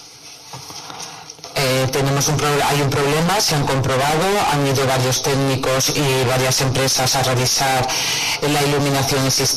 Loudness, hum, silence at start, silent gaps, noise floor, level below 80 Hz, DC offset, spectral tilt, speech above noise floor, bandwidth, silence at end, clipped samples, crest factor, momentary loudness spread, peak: -17 LUFS; none; 0 s; none; -39 dBFS; -42 dBFS; under 0.1%; -3.5 dB/octave; 22 dB; 14 kHz; 0 s; under 0.1%; 10 dB; 15 LU; -8 dBFS